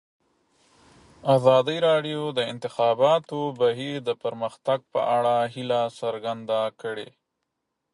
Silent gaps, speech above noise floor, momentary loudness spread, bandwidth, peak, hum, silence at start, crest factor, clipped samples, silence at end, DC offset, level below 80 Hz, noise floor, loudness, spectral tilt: none; 56 dB; 11 LU; 11.5 kHz; -6 dBFS; none; 1.25 s; 20 dB; under 0.1%; 0.9 s; under 0.1%; -72 dBFS; -80 dBFS; -24 LUFS; -6 dB/octave